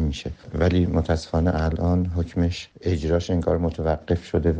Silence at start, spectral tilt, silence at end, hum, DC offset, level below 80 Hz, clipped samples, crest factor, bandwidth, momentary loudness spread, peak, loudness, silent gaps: 0 s; -7.5 dB/octave; 0 s; none; under 0.1%; -32 dBFS; under 0.1%; 16 dB; 8.4 kHz; 5 LU; -8 dBFS; -24 LUFS; none